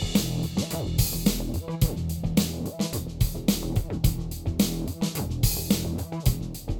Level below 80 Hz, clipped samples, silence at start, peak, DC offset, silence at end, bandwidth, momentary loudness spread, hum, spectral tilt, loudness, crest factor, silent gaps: -34 dBFS; under 0.1%; 0 s; -8 dBFS; under 0.1%; 0 s; over 20 kHz; 5 LU; none; -5 dB/octave; -27 LUFS; 18 dB; none